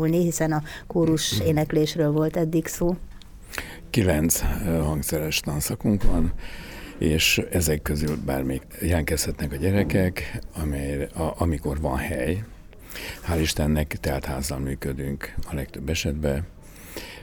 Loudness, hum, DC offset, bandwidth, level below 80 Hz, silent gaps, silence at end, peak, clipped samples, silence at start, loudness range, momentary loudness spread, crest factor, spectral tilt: -25 LUFS; none; under 0.1%; over 20 kHz; -34 dBFS; none; 0 s; -6 dBFS; under 0.1%; 0 s; 4 LU; 12 LU; 18 dB; -5 dB/octave